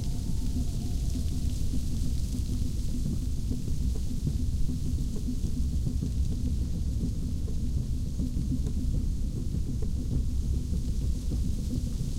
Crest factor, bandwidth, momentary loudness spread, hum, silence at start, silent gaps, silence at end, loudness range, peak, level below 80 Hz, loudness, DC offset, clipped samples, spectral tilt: 12 dB; 15.5 kHz; 2 LU; none; 0 s; none; 0 s; 1 LU; -16 dBFS; -30 dBFS; -32 LUFS; under 0.1%; under 0.1%; -7 dB/octave